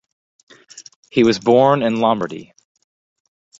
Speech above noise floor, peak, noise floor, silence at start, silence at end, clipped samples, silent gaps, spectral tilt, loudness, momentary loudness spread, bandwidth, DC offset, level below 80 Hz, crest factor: 28 dB; -2 dBFS; -43 dBFS; 0.75 s; 1.15 s; under 0.1%; 0.96-1.03 s; -6 dB/octave; -16 LUFS; 12 LU; 8 kHz; under 0.1%; -60 dBFS; 18 dB